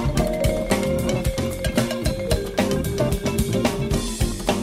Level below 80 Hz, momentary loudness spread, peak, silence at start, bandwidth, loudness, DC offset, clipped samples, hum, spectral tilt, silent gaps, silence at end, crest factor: -30 dBFS; 3 LU; -8 dBFS; 0 s; 16 kHz; -23 LUFS; under 0.1%; under 0.1%; none; -5.5 dB/octave; none; 0 s; 14 dB